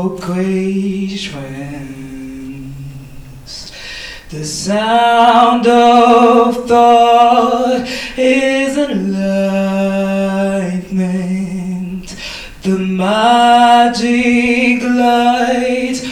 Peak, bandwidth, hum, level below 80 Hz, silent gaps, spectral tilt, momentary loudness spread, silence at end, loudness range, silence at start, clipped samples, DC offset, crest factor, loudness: 0 dBFS; 14 kHz; none; -42 dBFS; none; -5 dB/octave; 19 LU; 0 s; 14 LU; 0 s; under 0.1%; under 0.1%; 12 dB; -12 LUFS